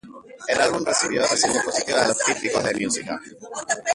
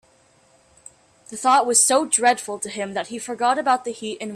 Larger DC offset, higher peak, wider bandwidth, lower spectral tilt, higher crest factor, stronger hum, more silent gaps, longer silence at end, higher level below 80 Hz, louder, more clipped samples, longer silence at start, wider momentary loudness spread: neither; about the same, -4 dBFS vs -4 dBFS; second, 11.5 kHz vs 15.5 kHz; about the same, -2 dB/octave vs -1 dB/octave; about the same, 18 dB vs 18 dB; neither; neither; about the same, 0 s vs 0 s; first, -58 dBFS vs -70 dBFS; about the same, -21 LUFS vs -20 LUFS; neither; second, 0.05 s vs 1.3 s; about the same, 14 LU vs 15 LU